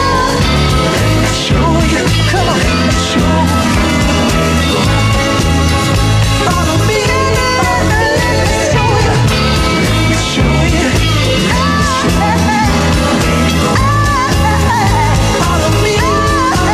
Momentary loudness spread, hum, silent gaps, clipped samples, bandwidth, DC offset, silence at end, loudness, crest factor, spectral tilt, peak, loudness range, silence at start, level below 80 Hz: 1 LU; none; none; under 0.1%; 15 kHz; under 0.1%; 0 s; -11 LUFS; 10 dB; -5 dB/octave; 0 dBFS; 0 LU; 0 s; -20 dBFS